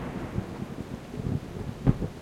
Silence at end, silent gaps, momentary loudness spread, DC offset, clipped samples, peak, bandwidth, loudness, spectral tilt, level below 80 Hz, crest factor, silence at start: 0 s; none; 10 LU; under 0.1%; under 0.1%; -6 dBFS; 14.5 kHz; -32 LUFS; -8 dB/octave; -42 dBFS; 24 dB; 0 s